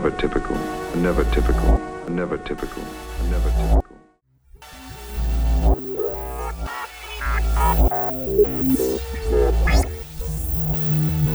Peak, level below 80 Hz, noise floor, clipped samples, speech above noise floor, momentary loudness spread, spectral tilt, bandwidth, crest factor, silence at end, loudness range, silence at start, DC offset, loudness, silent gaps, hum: -4 dBFS; -24 dBFS; -57 dBFS; under 0.1%; 37 dB; 12 LU; -6.5 dB/octave; over 20 kHz; 16 dB; 0 s; 6 LU; 0 s; under 0.1%; -22 LUFS; none; none